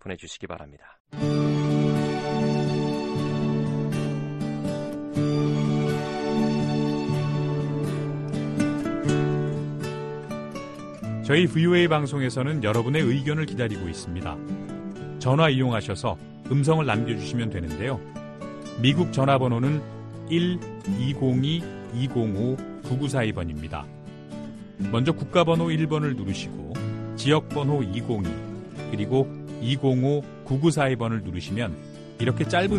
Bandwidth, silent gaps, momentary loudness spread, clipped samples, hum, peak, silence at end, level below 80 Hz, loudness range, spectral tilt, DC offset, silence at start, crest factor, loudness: 12 kHz; 1.00-1.05 s; 14 LU; under 0.1%; none; -6 dBFS; 0 s; -50 dBFS; 3 LU; -6.5 dB/octave; under 0.1%; 0.05 s; 20 dB; -25 LUFS